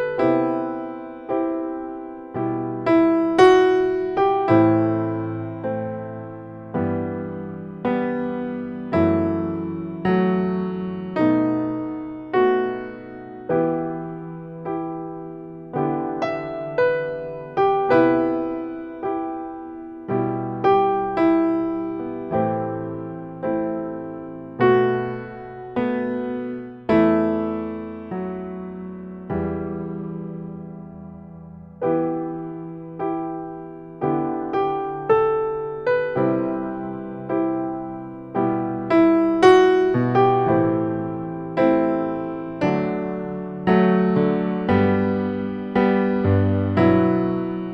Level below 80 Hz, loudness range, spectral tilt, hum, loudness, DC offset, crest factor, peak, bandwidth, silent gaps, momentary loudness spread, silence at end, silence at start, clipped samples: -52 dBFS; 9 LU; -8.5 dB/octave; none; -22 LUFS; under 0.1%; 20 dB; 0 dBFS; 8 kHz; none; 16 LU; 0 s; 0 s; under 0.1%